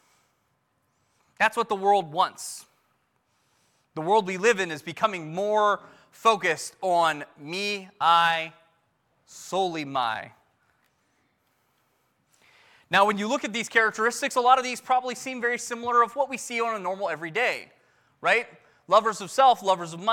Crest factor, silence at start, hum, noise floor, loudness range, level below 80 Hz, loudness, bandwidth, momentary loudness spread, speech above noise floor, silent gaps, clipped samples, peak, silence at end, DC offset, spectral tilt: 20 dB; 1.4 s; none; -72 dBFS; 8 LU; -76 dBFS; -25 LUFS; 17.5 kHz; 11 LU; 47 dB; none; under 0.1%; -6 dBFS; 0 s; under 0.1%; -3 dB/octave